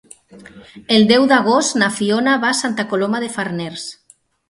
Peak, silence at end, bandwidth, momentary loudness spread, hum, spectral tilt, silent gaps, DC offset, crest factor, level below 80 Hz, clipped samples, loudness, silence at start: 0 dBFS; 0.55 s; 11.5 kHz; 15 LU; none; -3.5 dB/octave; none; under 0.1%; 18 dB; -60 dBFS; under 0.1%; -16 LUFS; 0.35 s